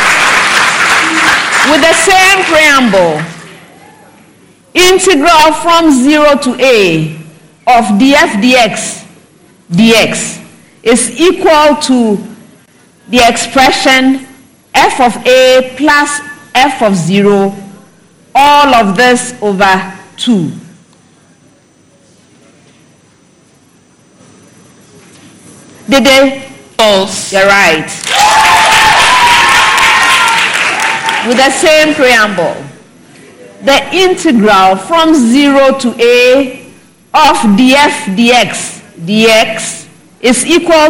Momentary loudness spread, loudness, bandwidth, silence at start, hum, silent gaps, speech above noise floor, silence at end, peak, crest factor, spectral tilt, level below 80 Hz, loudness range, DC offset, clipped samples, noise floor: 11 LU; -7 LUFS; 17 kHz; 0 s; none; none; 38 dB; 0 s; 0 dBFS; 8 dB; -3 dB/octave; -40 dBFS; 5 LU; under 0.1%; 0.2%; -45 dBFS